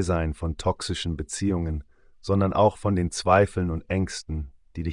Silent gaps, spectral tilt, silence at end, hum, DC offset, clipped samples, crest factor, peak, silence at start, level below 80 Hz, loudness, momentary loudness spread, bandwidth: none; -6 dB/octave; 0 s; none; under 0.1%; under 0.1%; 18 dB; -6 dBFS; 0 s; -42 dBFS; -26 LUFS; 14 LU; 10.5 kHz